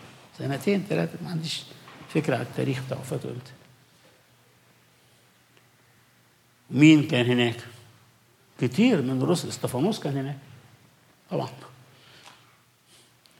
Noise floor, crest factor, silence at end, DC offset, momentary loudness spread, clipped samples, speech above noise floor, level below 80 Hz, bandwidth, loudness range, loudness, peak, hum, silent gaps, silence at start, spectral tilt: -61 dBFS; 22 dB; 1.1 s; under 0.1%; 19 LU; under 0.1%; 36 dB; -74 dBFS; 16 kHz; 14 LU; -25 LUFS; -6 dBFS; none; none; 0 s; -6 dB/octave